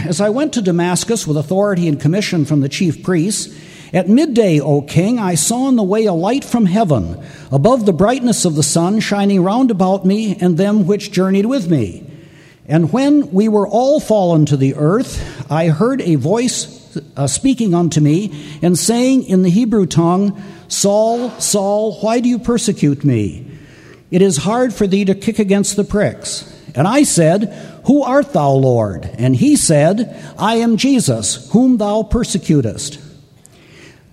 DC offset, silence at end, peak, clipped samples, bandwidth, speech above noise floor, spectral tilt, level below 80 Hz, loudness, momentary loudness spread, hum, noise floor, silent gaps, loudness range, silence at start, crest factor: under 0.1%; 1.05 s; 0 dBFS; under 0.1%; 15.5 kHz; 31 dB; -5.5 dB/octave; -40 dBFS; -14 LUFS; 7 LU; none; -44 dBFS; none; 2 LU; 0 s; 14 dB